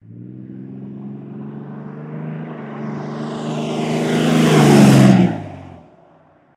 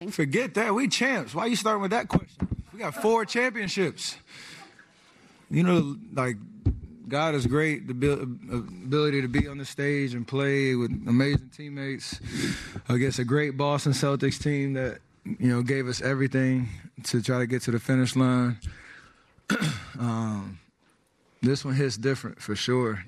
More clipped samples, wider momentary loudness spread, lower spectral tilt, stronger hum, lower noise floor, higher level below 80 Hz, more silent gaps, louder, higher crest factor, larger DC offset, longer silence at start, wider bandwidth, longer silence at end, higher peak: neither; first, 24 LU vs 11 LU; about the same, -6.5 dB/octave vs -5.5 dB/octave; neither; second, -51 dBFS vs -66 dBFS; about the same, -52 dBFS vs -48 dBFS; neither; first, -14 LUFS vs -27 LUFS; about the same, 18 dB vs 14 dB; neither; about the same, 0.1 s vs 0 s; first, 15.5 kHz vs 13.5 kHz; first, 0.8 s vs 0 s; first, 0 dBFS vs -12 dBFS